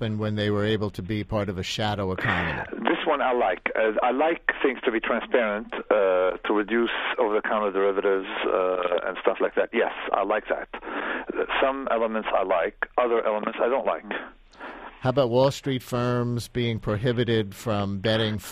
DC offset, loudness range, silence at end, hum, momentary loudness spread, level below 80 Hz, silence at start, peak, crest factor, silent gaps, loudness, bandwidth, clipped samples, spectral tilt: under 0.1%; 2 LU; 0 s; none; 7 LU; -52 dBFS; 0 s; -6 dBFS; 18 dB; none; -25 LUFS; 15 kHz; under 0.1%; -6 dB/octave